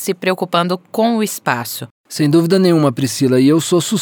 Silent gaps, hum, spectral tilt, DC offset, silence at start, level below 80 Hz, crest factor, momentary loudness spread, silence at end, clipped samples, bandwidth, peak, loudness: 1.91-2.04 s; none; -5.5 dB/octave; under 0.1%; 0 s; -68 dBFS; 14 dB; 8 LU; 0 s; under 0.1%; over 20 kHz; 0 dBFS; -15 LUFS